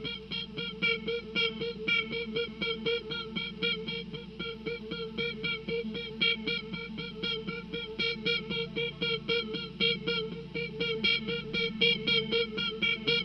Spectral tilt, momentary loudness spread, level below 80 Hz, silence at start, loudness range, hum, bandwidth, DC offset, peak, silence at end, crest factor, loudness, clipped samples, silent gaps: -5.5 dB/octave; 10 LU; -56 dBFS; 0 s; 5 LU; none; 6.6 kHz; under 0.1%; -12 dBFS; 0 s; 22 dB; -31 LUFS; under 0.1%; none